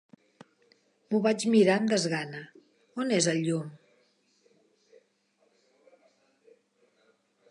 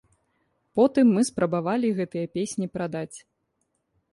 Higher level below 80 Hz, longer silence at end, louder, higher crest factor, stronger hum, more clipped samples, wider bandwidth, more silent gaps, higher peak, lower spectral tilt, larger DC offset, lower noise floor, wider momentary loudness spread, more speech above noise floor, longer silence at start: second, -82 dBFS vs -64 dBFS; first, 3.75 s vs 0.95 s; about the same, -27 LUFS vs -25 LUFS; about the same, 20 dB vs 18 dB; neither; neither; about the same, 11.5 kHz vs 11.5 kHz; neither; about the same, -10 dBFS vs -8 dBFS; second, -4.5 dB/octave vs -6 dB/octave; neither; second, -71 dBFS vs -75 dBFS; first, 20 LU vs 12 LU; second, 45 dB vs 51 dB; first, 1.1 s vs 0.75 s